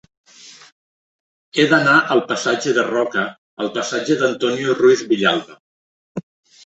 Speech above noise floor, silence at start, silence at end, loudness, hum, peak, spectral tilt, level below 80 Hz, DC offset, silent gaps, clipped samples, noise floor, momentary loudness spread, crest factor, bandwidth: over 73 dB; 0.45 s; 0.45 s; -17 LUFS; none; -2 dBFS; -4 dB/octave; -64 dBFS; under 0.1%; 0.72-1.52 s, 3.38-3.57 s, 5.60-6.15 s; under 0.1%; under -90 dBFS; 14 LU; 18 dB; 8.2 kHz